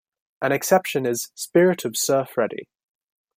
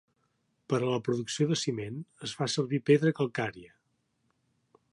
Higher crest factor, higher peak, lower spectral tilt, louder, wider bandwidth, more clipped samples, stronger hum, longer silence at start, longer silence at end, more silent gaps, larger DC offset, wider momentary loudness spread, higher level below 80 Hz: about the same, 20 dB vs 20 dB; first, -4 dBFS vs -10 dBFS; second, -4 dB/octave vs -5.5 dB/octave; first, -22 LUFS vs -30 LUFS; first, 16 kHz vs 11.5 kHz; neither; neither; second, 0.4 s vs 0.7 s; second, 0.75 s vs 1.25 s; neither; neither; second, 9 LU vs 12 LU; about the same, -70 dBFS vs -72 dBFS